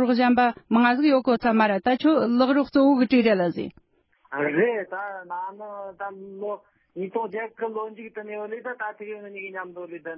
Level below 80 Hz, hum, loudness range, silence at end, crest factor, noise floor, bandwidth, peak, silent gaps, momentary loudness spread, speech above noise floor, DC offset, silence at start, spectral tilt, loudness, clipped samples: -64 dBFS; none; 12 LU; 0 s; 16 dB; -64 dBFS; 5.8 kHz; -8 dBFS; none; 17 LU; 40 dB; under 0.1%; 0 s; -10 dB/octave; -23 LUFS; under 0.1%